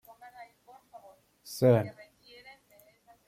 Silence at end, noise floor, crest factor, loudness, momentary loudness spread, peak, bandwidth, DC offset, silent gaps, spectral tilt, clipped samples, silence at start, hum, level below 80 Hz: 1.35 s; -62 dBFS; 22 dB; -27 LUFS; 28 LU; -12 dBFS; 16 kHz; under 0.1%; none; -7 dB/octave; under 0.1%; 0.4 s; none; -72 dBFS